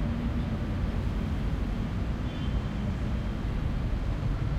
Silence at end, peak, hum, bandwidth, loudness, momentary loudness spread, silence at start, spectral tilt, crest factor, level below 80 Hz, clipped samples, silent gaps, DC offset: 0 s; -18 dBFS; none; 8.8 kHz; -32 LUFS; 1 LU; 0 s; -8 dB/octave; 12 dB; -32 dBFS; under 0.1%; none; under 0.1%